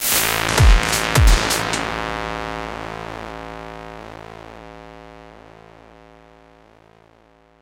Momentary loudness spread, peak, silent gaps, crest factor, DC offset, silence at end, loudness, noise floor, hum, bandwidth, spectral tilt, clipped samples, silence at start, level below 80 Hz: 24 LU; 0 dBFS; none; 22 dB; under 0.1%; 2.3 s; -19 LUFS; -53 dBFS; none; 16.5 kHz; -3.5 dB/octave; under 0.1%; 0 s; -24 dBFS